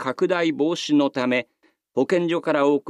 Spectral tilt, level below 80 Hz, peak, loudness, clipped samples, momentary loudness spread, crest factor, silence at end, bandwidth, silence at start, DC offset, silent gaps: -5.5 dB/octave; -76 dBFS; -6 dBFS; -22 LUFS; under 0.1%; 5 LU; 16 dB; 0 s; 10.5 kHz; 0 s; under 0.1%; none